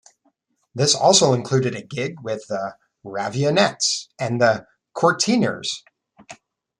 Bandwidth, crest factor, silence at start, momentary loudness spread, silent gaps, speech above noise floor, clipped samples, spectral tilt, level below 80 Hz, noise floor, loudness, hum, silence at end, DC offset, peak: 12 kHz; 22 dB; 0.75 s; 14 LU; none; 47 dB; under 0.1%; -3.5 dB/octave; -64 dBFS; -67 dBFS; -20 LUFS; none; 0.45 s; under 0.1%; 0 dBFS